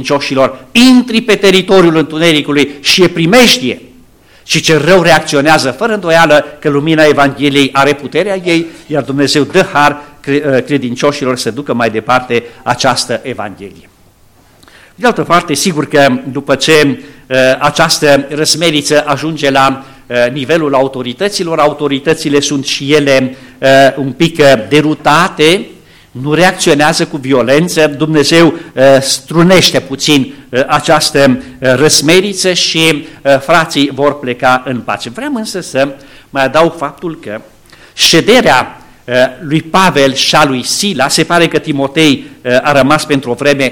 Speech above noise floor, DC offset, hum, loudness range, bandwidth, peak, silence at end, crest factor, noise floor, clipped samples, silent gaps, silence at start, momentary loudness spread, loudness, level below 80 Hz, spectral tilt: 35 dB; 0.8%; none; 5 LU; over 20 kHz; 0 dBFS; 0 s; 10 dB; -44 dBFS; under 0.1%; none; 0 s; 9 LU; -9 LUFS; -42 dBFS; -4 dB/octave